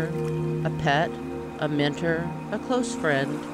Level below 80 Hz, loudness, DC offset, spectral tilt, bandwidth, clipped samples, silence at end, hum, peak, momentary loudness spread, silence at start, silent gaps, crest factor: -52 dBFS; -26 LUFS; under 0.1%; -6 dB/octave; 13 kHz; under 0.1%; 0 s; none; -10 dBFS; 7 LU; 0 s; none; 16 dB